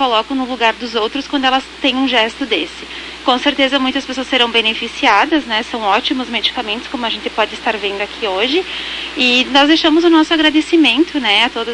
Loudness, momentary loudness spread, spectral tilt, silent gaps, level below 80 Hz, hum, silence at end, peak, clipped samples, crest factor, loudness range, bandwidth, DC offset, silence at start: -14 LUFS; 9 LU; -2.5 dB/octave; none; -46 dBFS; none; 0 s; 0 dBFS; under 0.1%; 14 dB; 5 LU; 11 kHz; under 0.1%; 0 s